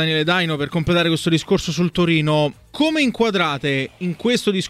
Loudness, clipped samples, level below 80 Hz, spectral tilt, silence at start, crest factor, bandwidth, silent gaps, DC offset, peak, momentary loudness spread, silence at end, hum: -19 LUFS; under 0.1%; -46 dBFS; -5.5 dB/octave; 0 s; 14 dB; 14.5 kHz; none; under 0.1%; -4 dBFS; 5 LU; 0 s; none